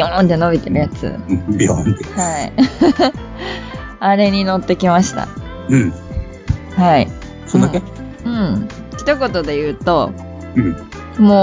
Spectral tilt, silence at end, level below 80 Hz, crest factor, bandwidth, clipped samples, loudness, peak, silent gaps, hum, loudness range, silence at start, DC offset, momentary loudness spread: -6 dB/octave; 0 s; -32 dBFS; 16 dB; 7.6 kHz; under 0.1%; -16 LUFS; 0 dBFS; none; none; 2 LU; 0 s; under 0.1%; 14 LU